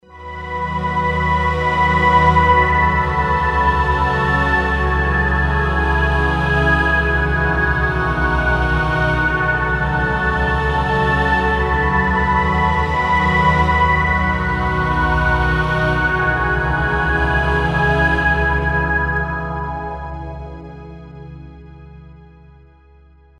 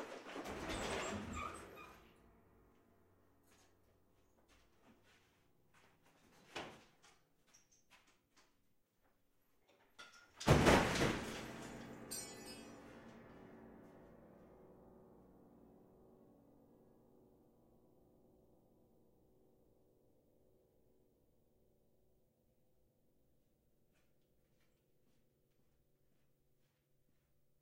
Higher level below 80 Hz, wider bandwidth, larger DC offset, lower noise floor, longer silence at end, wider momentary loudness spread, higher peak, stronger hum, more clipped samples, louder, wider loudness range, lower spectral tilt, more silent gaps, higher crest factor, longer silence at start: first, -24 dBFS vs -60 dBFS; second, 9.8 kHz vs 16 kHz; neither; second, -47 dBFS vs -79 dBFS; second, 1.15 s vs 12.75 s; second, 10 LU vs 29 LU; first, -2 dBFS vs -14 dBFS; neither; neither; first, -16 LUFS vs -39 LUFS; second, 6 LU vs 24 LU; first, -7 dB/octave vs -5 dB/octave; neither; second, 16 dB vs 32 dB; about the same, 0.1 s vs 0 s